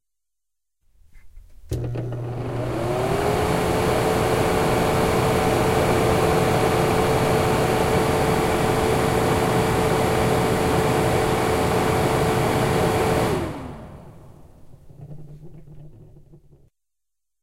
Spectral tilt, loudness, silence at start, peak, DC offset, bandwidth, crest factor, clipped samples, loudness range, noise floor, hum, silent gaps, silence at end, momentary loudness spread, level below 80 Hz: -5.5 dB/octave; -21 LUFS; 1.15 s; -6 dBFS; under 0.1%; 16 kHz; 16 dB; under 0.1%; 7 LU; -86 dBFS; none; none; 1.4 s; 9 LU; -38 dBFS